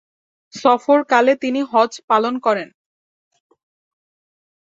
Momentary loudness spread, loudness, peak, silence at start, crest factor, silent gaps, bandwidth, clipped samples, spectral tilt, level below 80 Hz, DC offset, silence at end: 8 LU; -17 LUFS; -2 dBFS; 0.55 s; 18 dB; 2.03-2.08 s; 7.8 kHz; under 0.1%; -4 dB/octave; -70 dBFS; under 0.1%; 2.05 s